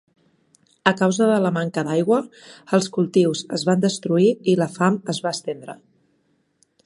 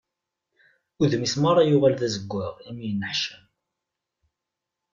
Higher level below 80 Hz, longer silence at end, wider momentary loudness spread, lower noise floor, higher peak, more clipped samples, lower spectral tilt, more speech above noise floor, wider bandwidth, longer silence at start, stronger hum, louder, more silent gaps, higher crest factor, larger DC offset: second, -68 dBFS vs -62 dBFS; second, 1.1 s vs 1.55 s; second, 8 LU vs 13 LU; second, -66 dBFS vs -85 dBFS; first, 0 dBFS vs -8 dBFS; neither; about the same, -5.5 dB/octave vs -5.5 dB/octave; second, 46 dB vs 62 dB; first, 11.5 kHz vs 7.6 kHz; second, 0.85 s vs 1 s; neither; first, -20 LUFS vs -23 LUFS; neither; about the same, 22 dB vs 18 dB; neither